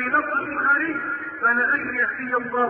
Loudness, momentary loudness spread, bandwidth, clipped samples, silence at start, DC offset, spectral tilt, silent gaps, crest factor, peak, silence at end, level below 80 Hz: -21 LUFS; 6 LU; 4.3 kHz; under 0.1%; 0 s; under 0.1%; -8.5 dB/octave; none; 14 dB; -8 dBFS; 0 s; -62 dBFS